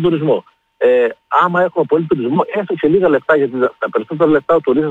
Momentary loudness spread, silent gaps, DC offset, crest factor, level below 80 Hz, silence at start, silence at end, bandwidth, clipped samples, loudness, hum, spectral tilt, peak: 5 LU; none; under 0.1%; 12 dB; -54 dBFS; 0 s; 0 s; 4.2 kHz; under 0.1%; -15 LUFS; none; -9 dB/octave; -2 dBFS